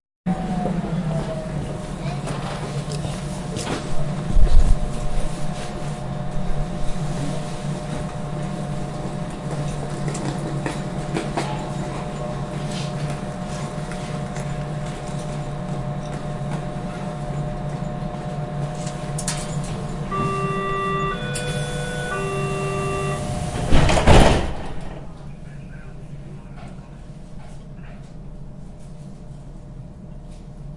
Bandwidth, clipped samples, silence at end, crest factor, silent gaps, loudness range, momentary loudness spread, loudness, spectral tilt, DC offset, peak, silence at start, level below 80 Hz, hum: 11.5 kHz; under 0.1%; 0 s; 22 dB; none; 17 LU; 16 LU; -25 LUFS; -5.5 dB/octave; under 0.1%; 0 dBFS; 0.25 s; -28 dBFS; none